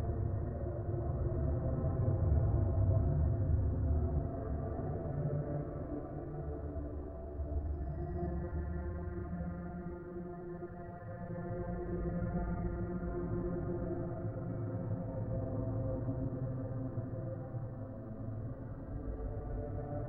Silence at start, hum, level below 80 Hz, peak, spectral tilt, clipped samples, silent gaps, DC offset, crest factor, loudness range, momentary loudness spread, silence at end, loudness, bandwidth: 0 s; none; -42 dBFS; -20 dBFS; -13.5 dB/octave; under 0.1%; none; under 0.1%; 16 dB; 8 LU; 11 LU; 0 s; -38 LUFS; 2.4 kHz